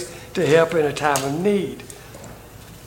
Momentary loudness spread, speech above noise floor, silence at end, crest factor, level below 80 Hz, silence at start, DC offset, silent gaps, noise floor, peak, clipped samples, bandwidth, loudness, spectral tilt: 23 LU; 22 dB; 0 s; 20 dB; -50 dBFS; 0 s; under 0.1%; none; -41 dBFS; -2 dBFS; under 0.1%; 17 kHz; -20 LUFS; -5 dB/octave